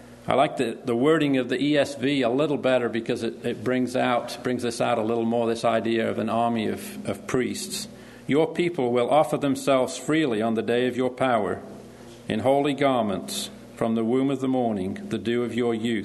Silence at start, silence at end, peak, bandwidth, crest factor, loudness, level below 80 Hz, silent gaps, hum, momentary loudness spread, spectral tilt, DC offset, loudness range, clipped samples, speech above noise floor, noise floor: 0 s; 0 s; -4 dBFS; 12.5 kHz; 20 dB; -24 LUFS; -62 dBFS; none; none; 9 LU; -5.5 dB/octave; under 0.1%; 2 LU; under 0.1%; 20 dB; -44 dBFS